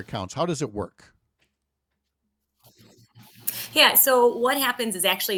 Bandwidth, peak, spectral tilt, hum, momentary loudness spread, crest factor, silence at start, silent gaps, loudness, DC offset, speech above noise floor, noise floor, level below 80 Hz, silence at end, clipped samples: 19.5 kHz; -2 dBFS; -2 dB/octave; none; 17 LU; 22 dB; 0 s; none; -21 LUFS; under 0.1%; 57 dB; -80 dBFS; -64 dBFS; 0 s; under 0.1%